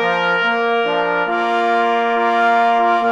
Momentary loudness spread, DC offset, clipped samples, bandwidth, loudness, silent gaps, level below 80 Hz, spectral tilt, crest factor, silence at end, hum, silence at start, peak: 3 LU; under 0.1%; under 0.1%; 8.6 kHz; -16 LUFS; none; -62 dBFS; -5 dB/octave; 12 dB; 0 s; none; 0 s; -4 dBFS